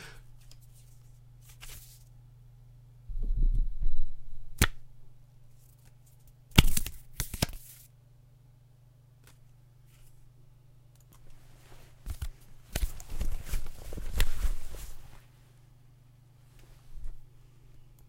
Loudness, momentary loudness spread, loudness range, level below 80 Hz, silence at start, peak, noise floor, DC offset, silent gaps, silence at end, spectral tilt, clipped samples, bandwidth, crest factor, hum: -34 LUFS; 27 LU; 18 LU; -34 dBFS; 0 s; -2 dBFS; -58 dBFS; under 0.1%; none; 0.9 s; -3.5 dB/octave; under 0.1%; 16.5 kHz; 28 dB; none